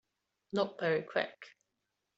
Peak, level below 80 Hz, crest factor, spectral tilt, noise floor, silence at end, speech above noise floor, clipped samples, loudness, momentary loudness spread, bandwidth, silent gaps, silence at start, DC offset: -16 dBFS; -80 dBFS; 22 dB; -3.5 dB/octave; -85 dBFS; 0.7 s; 51 dB; under 0.1%; -35 LUFS; 19 LU; 8 kHz; none; 0.55 s; under 0.1%